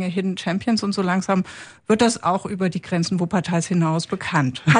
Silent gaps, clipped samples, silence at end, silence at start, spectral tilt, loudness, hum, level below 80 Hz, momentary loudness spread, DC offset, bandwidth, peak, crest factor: none; under 0.1%; 0 s; 0 s; -5.5 dB/octave; -22 LUFS; none; -56 dBFS; 5 LU; under 0.1%; 10.5 kHz; -2 dBFS; 18 dB